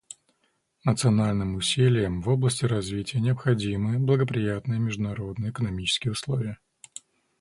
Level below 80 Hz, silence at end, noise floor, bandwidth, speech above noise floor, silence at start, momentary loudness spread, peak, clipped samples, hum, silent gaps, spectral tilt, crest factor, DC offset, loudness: -48 dBFS; 0.85 s; -72 dBFS; 11.5 kHz; 47 dB; 0.85 s; 16 LU; -8 dBFS; under 0.1%; none; none; -5.5 dB/octave; 18 dB; under 0.1%; -26 LUFS